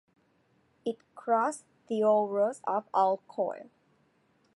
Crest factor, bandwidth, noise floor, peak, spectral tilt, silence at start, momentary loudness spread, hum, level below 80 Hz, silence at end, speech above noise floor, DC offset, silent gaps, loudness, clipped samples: 18 dB; 11.5 kHz; -69 dBFS; -14 dBFS; -5.5 dB/octave; 0.85 s; 13 LU; none; -86 dBFS; 0.95 s; 40 dB; under 0.1%; none; -30 LUFS; under 0.1%